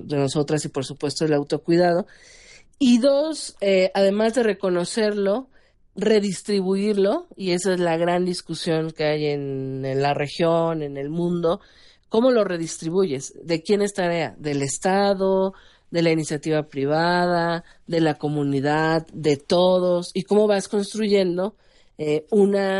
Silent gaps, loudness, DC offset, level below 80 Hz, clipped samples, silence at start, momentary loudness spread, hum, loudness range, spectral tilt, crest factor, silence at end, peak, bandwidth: none; -22 LUFS; under 0.1%; -58 dBFS; under 0.1%; 0 s; 8 LU; none; 3 LU; -5.5 dB/octave; 16 dB; 0 s; -6 dBFS; 11.5 kHz